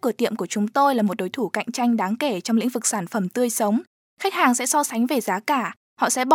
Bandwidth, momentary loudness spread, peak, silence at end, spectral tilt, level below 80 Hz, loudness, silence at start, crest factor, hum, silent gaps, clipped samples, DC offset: 17 kHz; 7 LU; -4 dBFS; 0 s; -3.5 dB/octave; -80 dBFS; -22 LUFS; 0.05 s; 18 dB; none; 3.87-4.17 s, 5.77-5.96 s; under 0.1%; under 0.1%